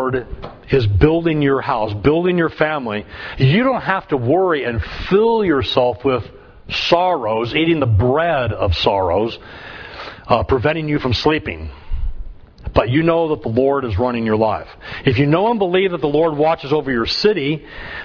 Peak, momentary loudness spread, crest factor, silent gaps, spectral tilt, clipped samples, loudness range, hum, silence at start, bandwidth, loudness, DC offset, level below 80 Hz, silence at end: 0 dBFS; 15 LU; 18 dB; none; -7.5 dB/octave; under 0.1%; 2 LU; none; 0 s; 5.4 kHz; -17 LUFS; under 0.1%; -34 dBFS; 0 s